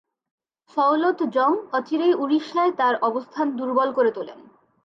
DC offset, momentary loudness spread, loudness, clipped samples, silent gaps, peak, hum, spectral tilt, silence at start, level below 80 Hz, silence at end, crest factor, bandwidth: under 0.1%; 6 LU; -22 LUFS; under 0.1%; none; -8 dBFS; none; -5.5 dB/octave; 0.75 s; -78 dBFS; 0.45 s; 14 dB; 7.2 kHz